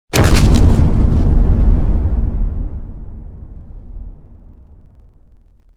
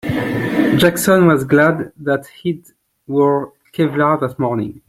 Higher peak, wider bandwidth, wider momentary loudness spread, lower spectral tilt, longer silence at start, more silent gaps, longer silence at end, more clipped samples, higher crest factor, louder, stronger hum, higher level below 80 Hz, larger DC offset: about the same, 0 dBFS vs -2 dBFS; second, 14.5 kHz vs 16.5 kHz; first, 25 LU vs 11 LU; about the same, -6 dB/octave vs -6 dB/octave; about the same, 0.15 s vs 0.05 s; neither; first, 1.65 s vs 0.1 s; neither; about the same, 14 dB vs 14 dB; about the same, -15 LUFS vs -16 LUFS; neither; first, -16 dBFS vs -50 dBFS; neither